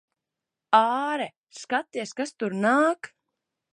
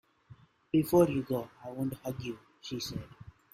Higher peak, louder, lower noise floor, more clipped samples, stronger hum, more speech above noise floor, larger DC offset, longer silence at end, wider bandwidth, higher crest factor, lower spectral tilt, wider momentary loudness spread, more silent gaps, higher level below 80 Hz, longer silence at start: first, -4 dBFS vs -12 dBFS; first, -25 LUFS vs -32 LUFS; first, -87 dBFS vs -58 dBFS; neither; neither; first, 62 dB vs 27 dB; neither; first, 0.65 s vs 0.25 s; second, 11.5 kHz vs 16 kHz; about the same, 22 dB vs 22 dB; second, -4.5 dB/octave vs -6.5 dB/octave; second, 14 LU vs 17 LU; first, 1.37-1.47 s vs none; second, -82 dBFS vs -60 dBFS; first, 0.7 s vs 0.3 s